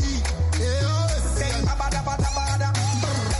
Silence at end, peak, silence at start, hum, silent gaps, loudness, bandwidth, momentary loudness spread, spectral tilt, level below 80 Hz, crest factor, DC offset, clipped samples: 0 s; -12 dBFS; 0 s; none; none; -24 LUFS; 11.5 kHz; 2 LU; -4.5 dB/octave; -28 dBFS; 10 dB; under 0.1%; under 0.1%